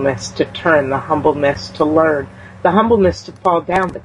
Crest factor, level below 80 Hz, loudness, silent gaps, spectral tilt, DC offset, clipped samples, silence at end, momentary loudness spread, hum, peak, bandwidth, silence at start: 14 dB; -44 dBFS; -16 LUFS; none; -6 dB/octave; under 0.1%; under 0.1%; 0.05 s; 7 LU; none; -2 dBFS; 11 kHz; 0 s